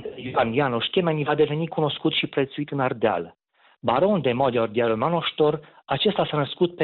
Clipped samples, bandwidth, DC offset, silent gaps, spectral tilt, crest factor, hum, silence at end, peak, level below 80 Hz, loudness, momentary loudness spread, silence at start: under 0.1%; 4.5 kHz; under 0.1%; none; -10 dB/octave; 14 dB; none; 0 s; -10 dBFS; -60 dBFS; -23 LUFS; 6 LU; 0 s